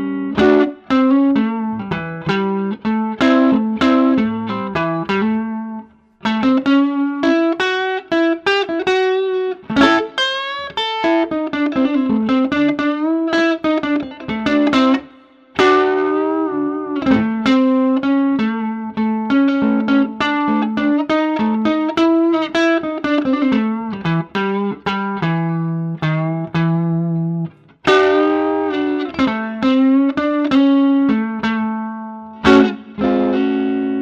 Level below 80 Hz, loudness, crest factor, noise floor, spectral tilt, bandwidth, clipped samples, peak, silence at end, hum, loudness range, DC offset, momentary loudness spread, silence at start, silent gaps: -50 dBFS; -17 LUFS; 16 dB; -45 dBFS; -6.5 dB/octave; 7.8 kHz; under 0.1%; 0 dBFS; 0 s; none; 2 LU; under 0.1%; 8 LU; 0 s; none